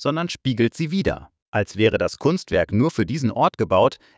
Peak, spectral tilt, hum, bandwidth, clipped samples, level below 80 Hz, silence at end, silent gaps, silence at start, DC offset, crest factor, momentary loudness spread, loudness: -4 dBFS; -6.5 dB/octave; none; 8 kHz; under 0.1%; -44 dBFS; 0.2 s; 1.42-1.53 s; 0 s; under 0.1%; 16 dB; 7 LU; -21 LUFS